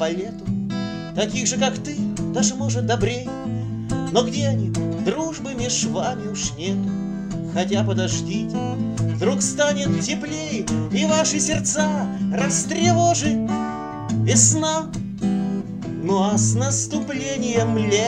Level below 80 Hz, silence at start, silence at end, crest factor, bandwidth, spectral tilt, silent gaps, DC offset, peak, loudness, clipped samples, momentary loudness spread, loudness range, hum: -46 dBFS; 0 s; 0 s; 20 dB; 10 kHz; -4.5 dB/octave; none; under 0.1%; -2 dBFS; -22 LUFS; under 0.1%; 9 LU; 4 LU; none